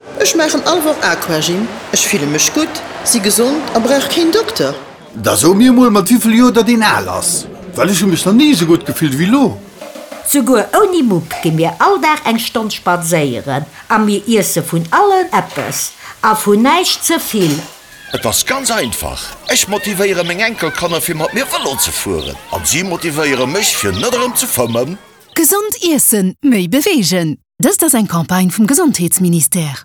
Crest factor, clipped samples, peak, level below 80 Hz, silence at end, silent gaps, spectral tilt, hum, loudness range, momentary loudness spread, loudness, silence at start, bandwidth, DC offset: 12 dB; under 0.1%; 0 dBFS; -44 dBFS; 0 s; none; -3.5 dB/octave; none; 4 LU; 9 LU; -12 LUFS; 0.05 s; 19.5 kHz; under 0.1%